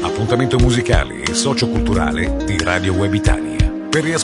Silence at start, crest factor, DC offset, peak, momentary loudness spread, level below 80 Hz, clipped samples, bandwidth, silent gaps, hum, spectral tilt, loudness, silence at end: 0 s; 16 dB; under 0.1%; 0 dBFS; 4 LU; -24 dBFS; under 0.1%; 11 kHz; none; none; -5 dB/octave; -17 LUFS; 0 s